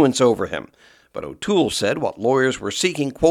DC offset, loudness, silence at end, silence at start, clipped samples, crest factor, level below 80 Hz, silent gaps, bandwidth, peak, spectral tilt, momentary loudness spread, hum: under 0.1%; -20 LUFS; 0 s; 0 s; under 0.1%; 18 dB; -50 dBFS; none; 15 kHz; -2 dBFS; -4.5 dB/octave; 13 LU; none